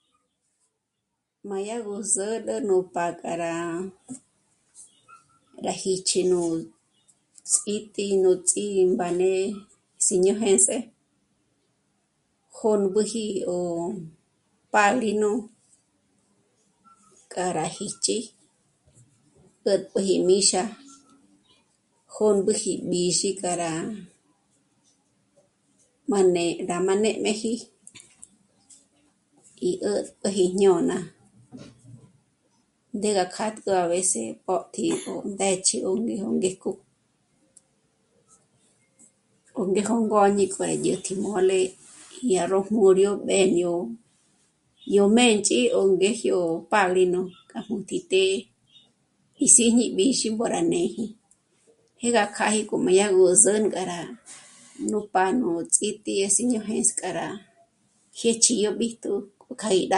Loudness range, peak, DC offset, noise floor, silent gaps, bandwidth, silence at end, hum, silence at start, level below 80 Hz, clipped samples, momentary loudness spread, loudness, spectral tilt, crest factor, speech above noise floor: 8 LU; 0 dBFS; under 0.1%; -80 dBFS; none; 11.5 kHz; 0 s; none; 1.45 s; -68 dBFS; under 0.1%; 15 LU; -23 LUFS; -3 dB/octave; 24 dB; 57 dB